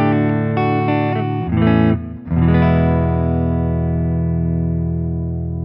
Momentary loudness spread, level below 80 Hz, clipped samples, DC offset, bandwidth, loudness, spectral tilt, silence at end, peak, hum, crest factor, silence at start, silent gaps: 7 LU; -30 dBFS; under 0.1%; under 0.1%; 5.2 kHz; -17 LUFS; -12.5 dB/octave; 0 s; -2 dBFS; none; 14 dB; 0 s; none